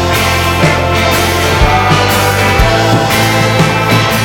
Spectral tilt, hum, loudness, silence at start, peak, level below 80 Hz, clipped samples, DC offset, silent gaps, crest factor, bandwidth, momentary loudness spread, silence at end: -4.5 dB/octave; none; -9 LUFS; 0 s; 0 dBFS; -22 dBFS; 0.2%; under 0.1%; none; 10 dB; over 20 kHz; 1 LU; 0 s